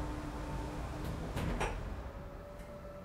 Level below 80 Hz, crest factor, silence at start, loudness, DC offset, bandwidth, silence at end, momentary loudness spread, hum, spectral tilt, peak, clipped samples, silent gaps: -44 dBFS; 18 dB; 0 s; -42 LUFS; under 0.1%; 16 kHz; 0 s; 11 LU; none; -6 dB/octave; -22 dBFS; under 0.1%; none